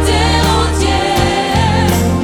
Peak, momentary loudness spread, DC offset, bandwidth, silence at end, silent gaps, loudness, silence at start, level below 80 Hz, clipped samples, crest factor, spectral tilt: 0 dBFS; 2 LU; under 0.1%; 19 kHz; 0 s; none; -13 LUFS; 0 s; -20 dBFS; under 0.1%; 12 dB; -5 dB/octave